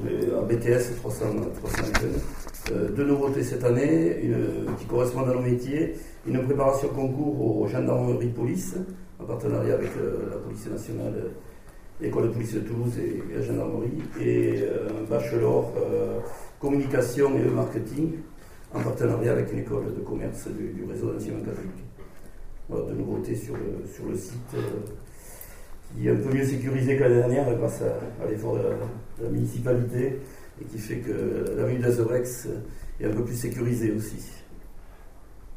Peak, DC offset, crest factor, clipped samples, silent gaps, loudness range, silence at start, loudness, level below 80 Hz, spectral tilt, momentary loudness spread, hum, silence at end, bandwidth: -8 dBFS; under 0.1%; 20 dB; under 0.1%; none; 8 LU; 0 s; -27 LUFS; -44 dBFS; -7.5 dB/octave; 13 LU; none; 0 s; 16 kHz